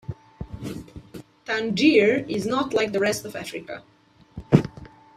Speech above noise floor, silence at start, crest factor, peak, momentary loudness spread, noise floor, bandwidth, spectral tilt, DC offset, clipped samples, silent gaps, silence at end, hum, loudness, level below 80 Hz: 22 dB; 0.1 s; 24 dB; 0 dBFS; 23 LU; -45 dBFS; 14.5 kHz; -5.5 dB/octave; under 0.1%; under 0.1%; none; 0.3 s; none; -22 LUFS; -50 dBFS